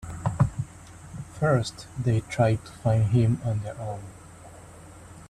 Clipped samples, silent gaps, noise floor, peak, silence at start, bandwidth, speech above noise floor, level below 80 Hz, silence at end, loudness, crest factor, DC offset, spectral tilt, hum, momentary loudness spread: under 0.1%; none; -46 dBFS; -10 dBFS; 0 s; 11.5 kHz; 22 dB; -48 dBFS; 0.05 s; -26 LUFS; 18 dB; under 0.1%; -7 dB/octave; none; 24 LU